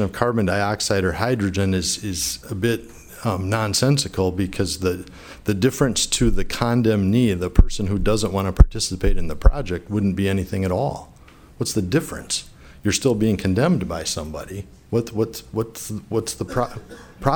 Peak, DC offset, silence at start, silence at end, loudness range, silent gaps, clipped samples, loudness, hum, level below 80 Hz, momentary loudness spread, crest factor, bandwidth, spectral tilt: 0 dBFS; under 0.1%; 0 s; 0 s; 4 LU; none; under 0.1%; -22 LUFS; none; -26 dBFS; 10 LU; 20 dB; 19 kHz; -5 dB/octave